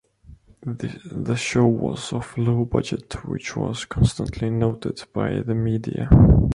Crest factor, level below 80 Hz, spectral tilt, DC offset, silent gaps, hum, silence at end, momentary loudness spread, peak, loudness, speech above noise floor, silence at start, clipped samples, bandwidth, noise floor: 20 dB; -30 dBFS; -7 dB/octave; under 0.1%; none; none; 0 s; 13 LU; -2 dBFS; -22 LUFS; 28 dB; 0.3 s; under 0.1%; 11 kHz; -48 dBFS